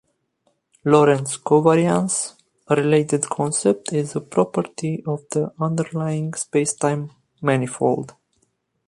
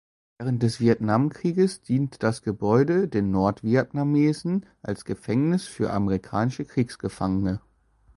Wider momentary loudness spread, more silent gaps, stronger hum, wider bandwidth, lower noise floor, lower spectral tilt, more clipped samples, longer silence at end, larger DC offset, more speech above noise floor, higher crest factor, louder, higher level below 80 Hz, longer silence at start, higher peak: first, 11 LU vs 8 LU; neither; neither; about the same, 11.5 kHz vs 11.5 kHz; first, -68 dBFS vs -60 dBFS; second, -5.5 dB/octave vs -7.5 dB/octave; neither; first, 0.8 s vs 0.6 s; neither; first, 48 dB vs 36 dB; about the same, 18 dB vs 18 dB; first, -21 LUFS vs -25 LUFS; second, -62 dBFS vs -50 dBFS; first, 0.85 s vs 0.4 s; first, -2 dBFS vs -6 dBFS